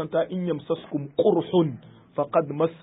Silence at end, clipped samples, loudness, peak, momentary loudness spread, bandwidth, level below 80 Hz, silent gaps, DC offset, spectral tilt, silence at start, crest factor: 0.05 s; under 0.1%; -25 LUFS; -8 dBFS; 8 LU; 4 kHz; -66 dBFS; none; under 0.1%; -12 dB/octave; 0 s; 16 dB